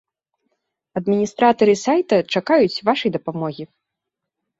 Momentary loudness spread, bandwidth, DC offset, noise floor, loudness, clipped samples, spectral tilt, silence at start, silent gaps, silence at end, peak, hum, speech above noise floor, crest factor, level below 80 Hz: 13 LU; 8 kHz; under 0.1%; -82 dBFS; -18 LUFS; under 0.1%; -5.5 dB/octave; 0.95 s; none; 0.95 s; -2 dBFS; none; 64 dB; 18 dB; -62 dBFS